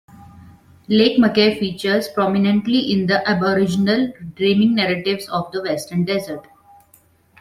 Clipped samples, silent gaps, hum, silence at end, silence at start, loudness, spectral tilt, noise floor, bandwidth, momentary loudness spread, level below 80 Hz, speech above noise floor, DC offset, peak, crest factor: under 0.1%; none; none; 1 s; 0.2 s; -18 LUFS; -6 dB/octave; -55 dBFS; 14.5 kHz; 9 LU; -56 dBFS; 37 dB; under 0.1%; -2 dBFS; 16 dB